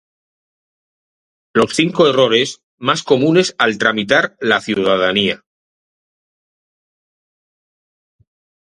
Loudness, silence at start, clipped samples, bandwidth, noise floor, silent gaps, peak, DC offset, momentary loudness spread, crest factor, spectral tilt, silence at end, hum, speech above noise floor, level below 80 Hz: -15 LUFS; 1.55 s; under 0.1%; 11.5 kHz; under -90 dBFS; 2.63-2.78 s; 0 dBFS; under 0.1%; 7 LU; 18 dB; -4 dB/octave; 3.3 s; none; over 76 dB; -58 dBFS